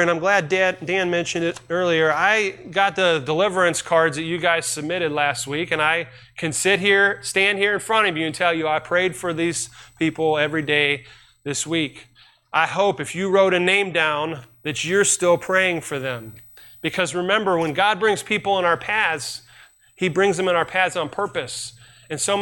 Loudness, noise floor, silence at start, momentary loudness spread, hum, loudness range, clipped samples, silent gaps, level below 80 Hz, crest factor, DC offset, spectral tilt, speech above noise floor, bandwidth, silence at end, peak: -20 LUFS; -51 dBFS; 0 s; 10 LU; none; 3 LU; under 0.1%; none; -60 dBFS; 16 dB; under 0.1%; -3 dB/octave; 30 dB; 17 kHz; 0 s; -4 dBFS